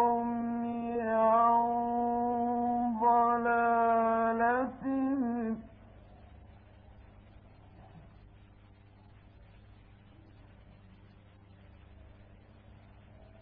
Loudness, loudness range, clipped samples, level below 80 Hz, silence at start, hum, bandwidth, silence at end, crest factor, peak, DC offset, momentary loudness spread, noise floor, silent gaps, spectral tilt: -29 LUFS; 11 LU; under 0.1%; -60 dBFS; 0 s; none; 3.8 kHz; 1.3 s; 16 dB; -16 dBFS; under 0.1%; 9 LU; -57 dBFS; none; -10 dB/octave